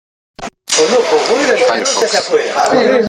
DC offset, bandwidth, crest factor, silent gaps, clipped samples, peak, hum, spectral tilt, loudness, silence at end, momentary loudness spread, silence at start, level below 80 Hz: under 0.1%; 14 kHz; 12 dB; none; under 0.1%; 0 dBFS; none; -2 dB/octave; -12 LUFS; 0 s; 11 LU; 0.4 s; -54 dBFS